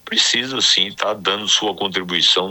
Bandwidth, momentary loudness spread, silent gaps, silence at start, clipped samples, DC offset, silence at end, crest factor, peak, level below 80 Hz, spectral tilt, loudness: 19 kHz; 6 LU; none; 0.05 s; under 0.1%; under 0.1%; 0 s; 16 dB; -2 dBFS; -62 dBFS; -1 dB/octave; -16 LUFS